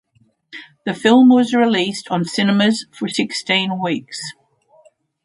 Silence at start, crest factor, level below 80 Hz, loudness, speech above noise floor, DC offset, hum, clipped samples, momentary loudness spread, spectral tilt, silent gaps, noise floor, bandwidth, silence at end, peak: 0.55 s; 18 dB; -66 dBFS; -16 LUFS; 40 dB; under 0.1%; none; under 0.1%; 18 LU; -5 dB/octave; none; -56 dBFS; 11.5 kHz; 0.95 s; 0 dBFS